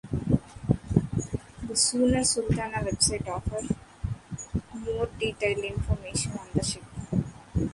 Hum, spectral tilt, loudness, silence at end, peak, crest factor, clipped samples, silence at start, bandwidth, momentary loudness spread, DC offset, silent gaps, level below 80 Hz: none; -4.5 dB/octave; -28 LUFS; 0 s; -6 dBFS; 24 dB; under 0.1%; 0.05 s; 11.5 kHz; 11 LU; under 0.1%; none; -40 dBFS